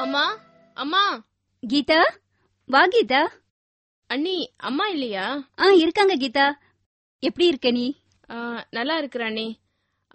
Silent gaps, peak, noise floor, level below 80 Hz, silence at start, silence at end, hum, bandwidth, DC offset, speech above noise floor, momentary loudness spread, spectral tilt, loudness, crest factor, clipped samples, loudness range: 3.50-4.02 s, 6.86-7.19 s; -4 dBFS; -73 dBFS; -66 dBFS; 0 s; 0.6 s; none; 8.4 kHz; under 0.1%; 51 dB; 16 LU; -4 dB/octave; -22 LUFS; 20 dB; under 0.1%; 3 LU